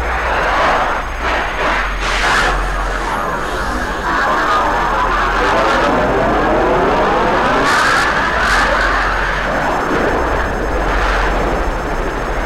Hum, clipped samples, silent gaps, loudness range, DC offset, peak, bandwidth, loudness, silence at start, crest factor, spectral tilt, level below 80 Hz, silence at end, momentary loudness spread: none; under 0.1%; none; 3 LU; under 0.1%; -2 dBFS; 15.5 kHz; -15 LUFS; 0 s; 12 dB; -4.5 dB/octave; -24 dBFS; 0 s; 6 LU